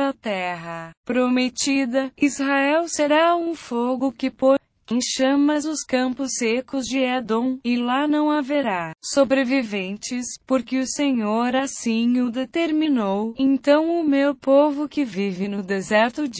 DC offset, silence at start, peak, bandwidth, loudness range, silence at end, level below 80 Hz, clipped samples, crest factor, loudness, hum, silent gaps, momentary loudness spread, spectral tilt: under 0.1%; 0 s; -4 dBFS; 8 kHz; 2 LU; 0 s; -62 dBFS; under 0.1%; 16 dB; -21 LUFS; none; 0.97-1.03 s; 8 LU; -4 dB/octave